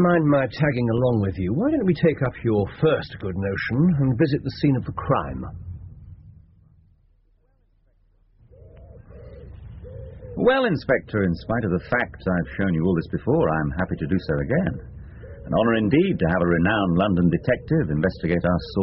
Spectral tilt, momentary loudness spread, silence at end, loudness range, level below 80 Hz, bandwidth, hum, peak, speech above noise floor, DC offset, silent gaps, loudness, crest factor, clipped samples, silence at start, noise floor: -6.5 dB/octave; 19 LU; 0 s; 7 LU; -42 dBFS; 5.8 kHz; none; -6 dBFS; 40 dB; under 0.1%; none; -22 LUFS; 16 dB; under 0.1%; 0 s; -62 dBFS